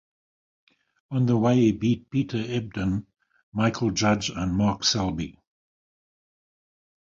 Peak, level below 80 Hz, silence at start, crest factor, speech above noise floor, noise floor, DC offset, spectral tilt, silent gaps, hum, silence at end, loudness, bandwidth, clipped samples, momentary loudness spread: -8 dBFS; -48 dBFS; 1.1 s; 18 dB; over 66 dB; under -90 dBFS; under 0.1%; -5.5 dB/octave; 3.43-3.52 s; none; 1.75 s; -25 LUFS; 7.6 kHz; under 0.1%; 11 LU